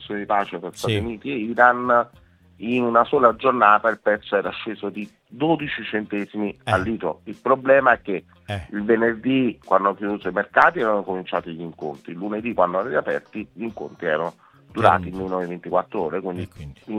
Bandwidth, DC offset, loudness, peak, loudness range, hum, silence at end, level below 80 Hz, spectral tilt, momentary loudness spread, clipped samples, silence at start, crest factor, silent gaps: 13 kHz; under 0.1%; -21 LUFS; 0 dBFS; 6 LU; none; 0 s; -56 dBFS; -6.5 dB/octave; 15 LU; under 0.1%; 0 s; 22 dB; none